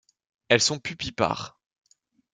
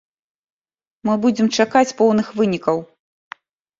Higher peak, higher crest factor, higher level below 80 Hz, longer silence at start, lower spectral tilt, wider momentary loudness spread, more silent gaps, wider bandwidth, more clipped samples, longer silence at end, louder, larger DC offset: about the same, -4 dBFS vs -2 dBFS; first, 24 dB vs 18 dB; about the same, -58 dBFS vs -62 dBFS; second, 0.5 s vs 1.05 s; second, -2.5 dB/octave vs -5 dB/octave; first, 12 LU vs 7 LU; neither; first, 10 kHz vs 7.8 kHz; neither; about the same, 0.85 s vs 0.95 s; second, -25 LUFS vs -18 LUFS; neither